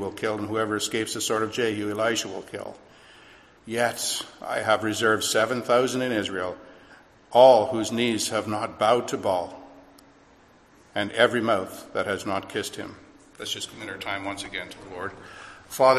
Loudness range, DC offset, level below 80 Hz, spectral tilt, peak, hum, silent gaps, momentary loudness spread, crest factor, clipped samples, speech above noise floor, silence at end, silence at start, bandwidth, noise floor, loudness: 8 LU; under 0.1%; -60 dBFS; -3.5 dB/octave; -4 dBFS; none; none; 15 LU; 22 dB; under 0.1%; 31 dB; 0 s; 0 s; 15 kHz; -55 dBFS; -25 LUFS